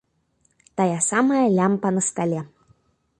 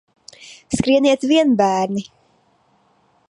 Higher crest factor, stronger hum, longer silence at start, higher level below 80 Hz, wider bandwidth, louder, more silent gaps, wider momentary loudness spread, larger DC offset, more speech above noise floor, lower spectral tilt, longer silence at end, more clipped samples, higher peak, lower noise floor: about the same, 16 dB vs 16 dB; neither; first, 0.75 s vs 0.4 s; second, -64 dBFS vs -50 dBFS; about the same, 11.5 kHz vs 11 kHz; second, -21 LUFS vs -17 LUFS; neither; about the same, 12 LU vs 12 LU; neither; about the same, 46 dB vs 43 dB; about the same, -5.5 dB/octave vs -5 dB/octave; second, 0.75 s vs 1.25 s; neither; second, -8 dBFS vs -2 dBFS; first, -67 dBFS vs -59 dBFS